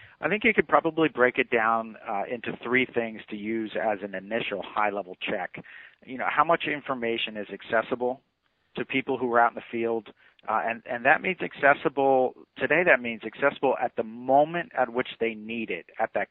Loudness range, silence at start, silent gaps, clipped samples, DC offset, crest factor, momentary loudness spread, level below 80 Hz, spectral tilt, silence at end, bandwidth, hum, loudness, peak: 5 LU; 0 s; none; under 0.1%; under 0.1%; 22 dB; 11 LU; -68 dBFS; -9 dB/octave; 0.05 s; 4.2 kHz; none; -26 LUFS; -4 dBFS